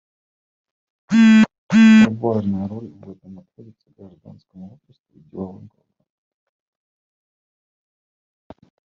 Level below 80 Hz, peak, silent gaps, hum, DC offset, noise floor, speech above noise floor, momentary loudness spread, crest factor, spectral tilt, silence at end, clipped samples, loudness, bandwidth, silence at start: -62 dBFS; -4 dBFS; 1.58-1.69 s, 5.00-5.04 s; none; under 0.1%; under -90 dBFS; over 61 dB; 23 LU; 18 dB; -6.5 dB/octave; 3.45 s; under 0.1%; -14 LUFS; 7.8 kHz; 1.1 s